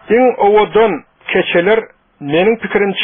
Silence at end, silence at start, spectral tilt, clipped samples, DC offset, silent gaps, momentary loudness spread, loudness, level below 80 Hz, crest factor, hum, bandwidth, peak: 0 s; 0.1 s; -3 dB/octave; under 0.1%; under 0.1%; none; 7 LU; -13 LUFS; -46 dBFS; 12 dB; none; 3.8 kHz; 0 dBFS